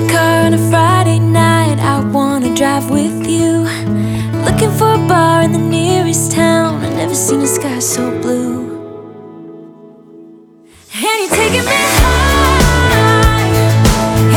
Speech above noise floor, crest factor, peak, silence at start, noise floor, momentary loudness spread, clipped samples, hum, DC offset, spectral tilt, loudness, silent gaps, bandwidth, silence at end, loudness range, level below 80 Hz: 28 dB; 12 dB; 0 dBFS; 0 s; -42 dBFS; 7 LU; under 0.1%; none; under 0.1%; -5 dB/octave; -12 LUFS; none; 18.5 kHz; 0 s; 8 LU; -24 dBFS